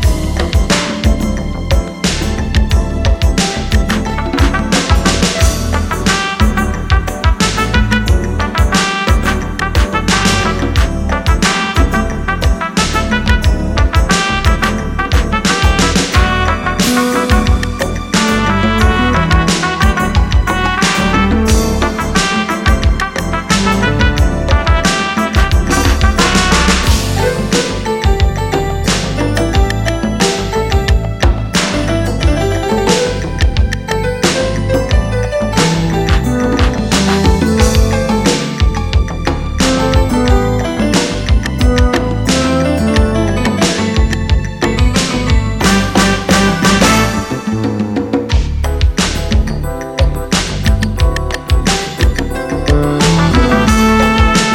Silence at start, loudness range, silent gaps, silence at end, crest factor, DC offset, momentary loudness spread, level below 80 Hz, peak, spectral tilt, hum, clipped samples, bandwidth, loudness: 0 s; 2 LU; none; 0 s; 12 dB; under 0.1%; 5 LU; -16 dBFS; 0 dBFS; -4.5 dB/octave; none; under 0.1%; 17 kHz; -13 LUFS